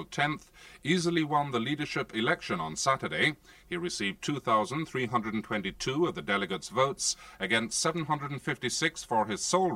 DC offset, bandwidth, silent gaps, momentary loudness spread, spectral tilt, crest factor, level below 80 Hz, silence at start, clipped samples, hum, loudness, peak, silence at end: under 0.1%; 16 kHz; none; 6 LU; -3.5 dB/octave; 18 dB; -60 dBFS; 0 s; under 0.1%; none; -30 LUFS; -12 dBFS; 0 s